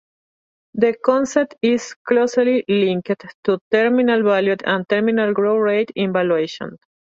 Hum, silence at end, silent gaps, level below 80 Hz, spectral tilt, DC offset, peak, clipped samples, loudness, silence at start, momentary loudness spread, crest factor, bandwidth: none; 0.35 s; 1.96-2.05 s, 3.34-3.43 s, 3.61-3.71 s; -64 dBFS; -5.5 dB/octave; under 0.1%; -2 dBFS; under 0.1%; -18 LUFS; 0.75 s; 7 LU; 16 dB; 7.8 kHz